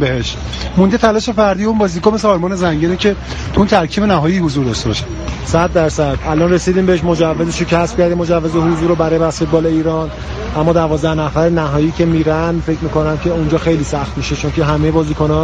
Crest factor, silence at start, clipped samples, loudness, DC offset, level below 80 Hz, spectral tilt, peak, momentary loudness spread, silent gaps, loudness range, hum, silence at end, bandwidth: 14 dB; 0 s; under 0.1%; -14 LUFS; under 0.1%; -28 dBFS; -6.5 dB/octave; 0 dBFS; 6 LU; none; 1 LU; none; 0 s; 9.6 kHz